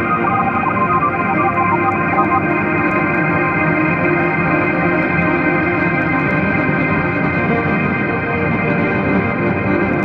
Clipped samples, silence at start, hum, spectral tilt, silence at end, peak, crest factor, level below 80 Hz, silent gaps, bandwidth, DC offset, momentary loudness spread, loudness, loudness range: under 0.1%; 0 s; none; -9.5 dB/octave; 0 s; -2 dBFS; 14 dB; -42 dBFS; none; 5.6 kHz; under 0.1%; 2 LU; -15 LUFS; 1 LU